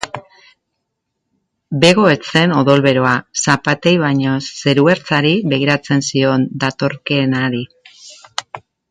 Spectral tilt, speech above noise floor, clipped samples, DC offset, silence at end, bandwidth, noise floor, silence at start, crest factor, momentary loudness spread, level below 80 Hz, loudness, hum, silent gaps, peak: -5 dB/octave; 60 dB; under 0.1%; under 0.1%; 0.3 s; 11.5 kHz; -74 dBFS; 0 s; 16 dB; 15 LU; -54 dBFS; -14 LUFS; none; none; 0 dBFS